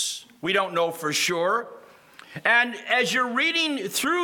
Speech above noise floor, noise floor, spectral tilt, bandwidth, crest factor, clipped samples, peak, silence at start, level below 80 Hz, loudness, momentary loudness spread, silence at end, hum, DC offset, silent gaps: 25 dB; -49 dBFS; -2 dB/octave; 19 kHz; 20 dB; under 0.1%; -6 dBFS; 0 s; -74 dBFS; -23 LUFS; 8 LU; 0 s; none; under 0.1%; none